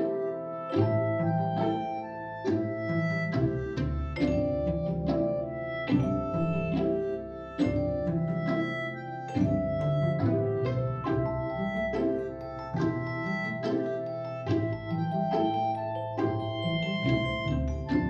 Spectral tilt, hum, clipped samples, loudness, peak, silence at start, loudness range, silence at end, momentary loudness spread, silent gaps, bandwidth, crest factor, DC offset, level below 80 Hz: -8.5 dB/octave; none; under 0.1%; -30 LUFS; -12 dBFS; 0 s; 2 LU; 0 s; 6 LU; none; 7.8 kHz; 16 dB; under 0.1%; -44 dBFS